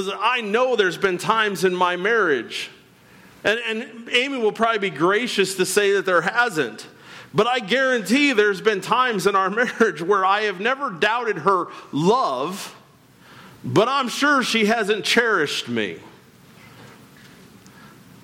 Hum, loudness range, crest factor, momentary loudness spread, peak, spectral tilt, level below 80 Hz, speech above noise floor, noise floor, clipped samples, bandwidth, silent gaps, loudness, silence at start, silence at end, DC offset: none; 3 LU; 16 dB; 9 LU; -6 dBFS; -3.5 dB/octave; -66 dBFS; 30 dB; -51 dBFS; under 0.1%; 16.5 kHz; none; -20 LUFS; 0 s; 0.35 s; under 0.1%